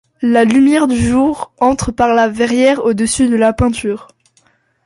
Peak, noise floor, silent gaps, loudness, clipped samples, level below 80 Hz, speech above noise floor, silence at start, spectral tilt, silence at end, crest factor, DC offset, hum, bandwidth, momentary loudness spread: 0 dBFS; -56 dBFS; none; -13 LUFS; under 0.1%; -36 dBFS; 44 dB; 0.2 s; -5 dB/octave; 0.85 s; 12 dB; under 0.1%; none; 11.5 kHz; 6 LU